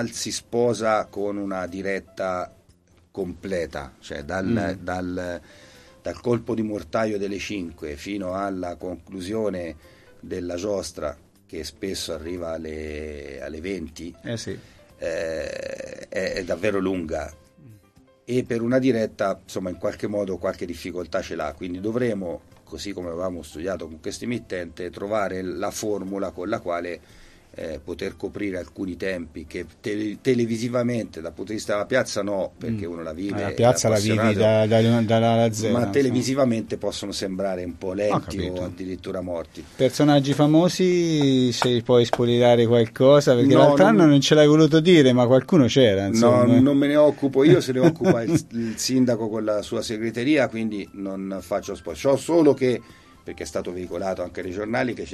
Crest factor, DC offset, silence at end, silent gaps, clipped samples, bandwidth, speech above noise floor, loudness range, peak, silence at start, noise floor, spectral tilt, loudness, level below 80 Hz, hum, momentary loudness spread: 20 dB; under 0.1%; 0 s; none; under 0.1%; 13 kHz; 35 dB; 14 LU; -4 dBFS; 0 s; -57 dBFS; -6 dB/octave; -22 LUFS; -52 dBFS; none; 17 LU